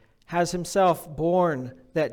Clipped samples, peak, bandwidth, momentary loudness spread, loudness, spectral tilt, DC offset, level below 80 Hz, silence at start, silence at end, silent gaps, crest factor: under 0.1%; -10 dBFS; 19 kHz; 9 LU; -25 LUFS; -5.5 dB/octave; under 0.1%; -54 dBFS; 0.3 s; 0 s; none; 14 dB